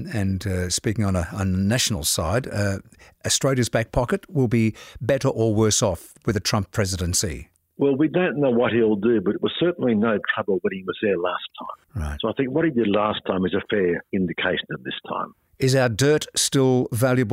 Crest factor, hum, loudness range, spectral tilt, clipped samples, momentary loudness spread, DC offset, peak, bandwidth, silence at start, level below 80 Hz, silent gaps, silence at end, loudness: 16 dB; none; 2 LU; -4.5 dB/octave; under 0.1%; 10 LU; under 0.1%; -8 dBFS; 16 kHz; 0 s; -44 dBFS; none; 0 s; -22 LUFS